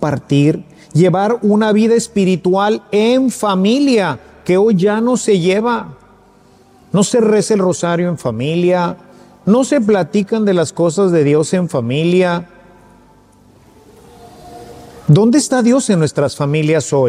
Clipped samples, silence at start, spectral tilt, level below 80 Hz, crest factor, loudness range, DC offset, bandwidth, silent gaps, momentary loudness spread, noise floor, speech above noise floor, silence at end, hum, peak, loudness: under 0.1%; 0 s; -6 dB/octave; -54 dBFS; 14 dB; 4 LU; under 0.1%; 14.5 kHz; none; 7 LU; -47 dBFS; 34 dB; 0 s; none; 0 dBFS; -14 LUFS